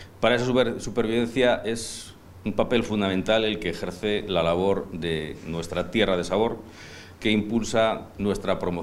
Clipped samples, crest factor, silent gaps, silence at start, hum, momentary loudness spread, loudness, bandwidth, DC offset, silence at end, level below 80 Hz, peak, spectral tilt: under 0.1%; 20 dB; none; 0 s; none; 10 LU; -25 LUFS; 15.5 kHz; under 0.1%; 0 s; -46 dBFS; -4 dBFS; -5 dB/octave